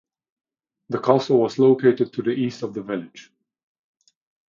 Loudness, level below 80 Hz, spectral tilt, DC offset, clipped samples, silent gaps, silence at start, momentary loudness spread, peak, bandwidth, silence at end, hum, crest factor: -21 LUFS; -68 dBFS; -7.5 dB/octave; under 0.1%; under 0.1%; none; 0.9 s; 14 LU; -2 dBFS; 7.4 kHz; 1.25 s; none; 20 dB